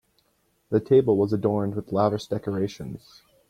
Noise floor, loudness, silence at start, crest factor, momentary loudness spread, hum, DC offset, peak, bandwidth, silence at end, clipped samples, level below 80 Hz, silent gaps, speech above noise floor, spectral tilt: -69 dBFS; -24 LUFS; 0.7 s; 18 dB; 15 LU; none; under 0.1%; -8 dBFS; 10.5 kHz; 0.5 s; under 0.1%; -58 dBFS; none; 45 dB; -8 dB/octave